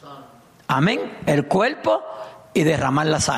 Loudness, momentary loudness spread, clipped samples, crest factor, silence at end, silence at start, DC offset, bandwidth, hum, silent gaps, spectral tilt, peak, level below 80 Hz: -20 LUFS; 10 LU; under 0.1%; 14 dB; 0 s; 0.05 s; under 0.1%; 14.5 kHz; none; none; -5 dB/octave; -8 dBFS; -52 dBFS